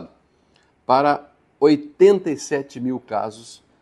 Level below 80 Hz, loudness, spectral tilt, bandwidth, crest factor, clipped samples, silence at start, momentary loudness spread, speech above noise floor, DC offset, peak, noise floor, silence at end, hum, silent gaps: -66 dBFS; -19 LUFS; -5.5 dB/octave; 11.5 kHz; 18 dB; under 0.1%; 0 s; 13 LU; 41 dB; under 0.1%; -2 dBFS; -60 dBFS; 0.3 s; none; none